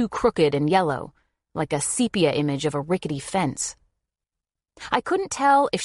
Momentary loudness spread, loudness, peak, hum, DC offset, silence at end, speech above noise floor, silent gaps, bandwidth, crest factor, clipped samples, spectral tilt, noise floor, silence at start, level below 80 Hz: 11 LU; -23 LUFS; -4 dBFS; none; under 0.1%; 0 s; 65 dB; none; 11.5 kHz; 20 dB; under 0.1%; -4.5 dB/octave; -88 dBFS; 0 s; -54 dBFS